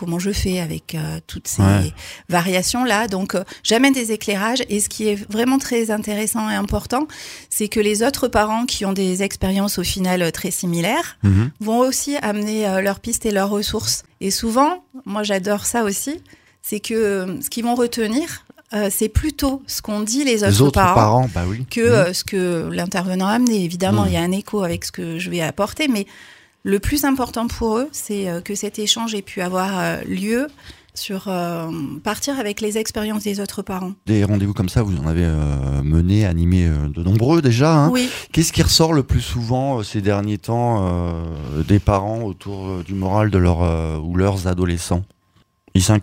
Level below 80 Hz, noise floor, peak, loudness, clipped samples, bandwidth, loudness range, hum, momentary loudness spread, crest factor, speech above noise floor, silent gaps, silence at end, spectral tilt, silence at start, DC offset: -34 dBFS; -59 dBFS; 0 dBFS; -19 LUFS; under 0.1%; 16.5 kHz; 5 LU; none; 10 LU; 18 dB; 40 dB; none; 0 s; -5 dB/octave; 0 s; under 0.1%